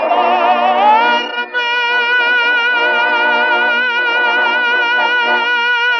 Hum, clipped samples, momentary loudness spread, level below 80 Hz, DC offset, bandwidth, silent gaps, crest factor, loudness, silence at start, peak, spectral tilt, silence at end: none; under 0.1%; 2 LU; -88 dBFS; under 0.1%; 6.6 kHz; none; 12 dB; -12 LUFS; 0 s; 0 dBFS; -1 dB/octave; 0 s